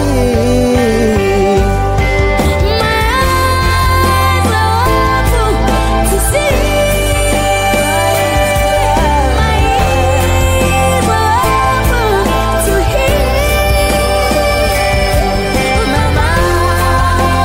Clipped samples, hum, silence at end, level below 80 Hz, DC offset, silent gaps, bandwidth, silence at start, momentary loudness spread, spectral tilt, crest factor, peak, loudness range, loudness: under 0.1%; none; 0 s; -16 dBFS; under 0.1%; none; 16.5 kHz; 0 s; 1 LU; -5 dB/octave; 10 dB; 0 dBFS; 1 LU; -11 LUFS